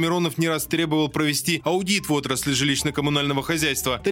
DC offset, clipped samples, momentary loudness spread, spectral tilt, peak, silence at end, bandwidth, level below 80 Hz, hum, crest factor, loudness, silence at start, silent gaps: under 0.1%; under 0.1%; 2 LU; -4 dB/octave; -6 dBFS; 0 s; 17 kHz; -48 dBFS; none; 18 dB; -22 LUFS; 0 s; none